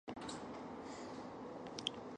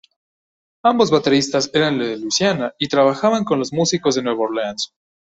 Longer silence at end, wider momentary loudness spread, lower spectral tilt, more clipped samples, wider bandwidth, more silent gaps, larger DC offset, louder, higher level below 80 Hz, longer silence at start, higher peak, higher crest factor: second, 0 s vs 0.5 s; about the same, 6 LU vs 7 LU; about the same, -3.5 dB/octave vs -4 dB/octave; neither; first, 11 kHz vs 8.2 kHz; neither; neither; second, -47 LUFS vs -18 LUFS; second, -72 dBFS vs -58 dBFS; second, 0.05 s vs 0.85 s; second, -20 dBFS vs -2 dBFS; first, 28 dB vs 16 dB